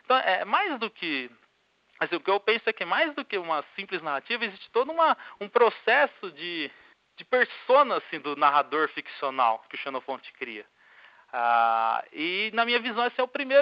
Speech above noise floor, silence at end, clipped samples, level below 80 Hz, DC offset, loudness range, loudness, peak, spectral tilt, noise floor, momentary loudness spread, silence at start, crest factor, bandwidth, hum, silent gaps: 41 dB; 0 s; under 0.1%; -86 dBFS; under 0.1%; 3 LU; -26 LUFS; -8 dBFS; -6 dB/octave; -68 dBFS; 12 LU; 0.1 s; 18 dB; 5.6 kHz; none; none